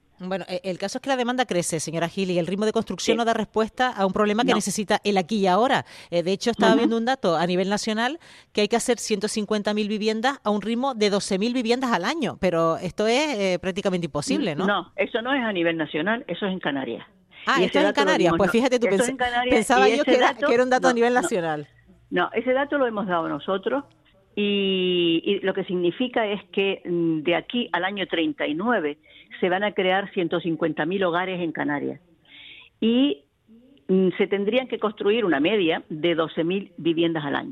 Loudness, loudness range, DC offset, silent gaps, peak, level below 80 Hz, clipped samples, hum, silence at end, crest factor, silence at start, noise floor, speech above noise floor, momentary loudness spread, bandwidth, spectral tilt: -23 LUFS; 5 LU; under 0.1%; none; -6 dBFS; -58 dBFS; under 0.1%; none; 0 s; 18 dB; 0.2 s; -54 dBFS; 31 dB; 8 LU; 13.5 kHz; -4.5 dB/octave